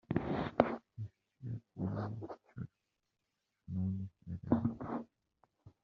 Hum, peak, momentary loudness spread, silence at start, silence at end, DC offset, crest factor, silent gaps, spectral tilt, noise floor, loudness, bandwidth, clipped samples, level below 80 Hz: none; -8 dBFS; 15 LU; 0.1 s; 0.15 s; under 0.1%; 32 dB; none; -8 dB/octave; -86 dBFS; -39 LUFS; 6.2 kHz; under 0.1%; -64 dBFS